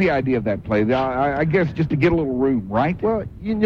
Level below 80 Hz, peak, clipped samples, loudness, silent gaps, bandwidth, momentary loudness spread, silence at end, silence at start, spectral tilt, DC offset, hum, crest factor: -40 dBFS; -4 dBFS; under 0.1%; -20 LUFS; none; 7 kHz; 4 LU; 0 s; 0 s; -9 dB/octave; under 0.1%; none; 14 dB